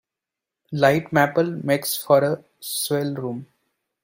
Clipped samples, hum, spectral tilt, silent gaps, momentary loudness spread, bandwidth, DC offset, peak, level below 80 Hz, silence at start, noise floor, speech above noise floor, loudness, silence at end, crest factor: under 0.1%; none; -5 dB/octave; none; 12 LU; 16.5 kHz; under 0.1%; -4 dBFS; -64 dBFS; 0.7 s; -87 dBFS; 66 dB; -21 LUFS; 0.6 s; 20 dB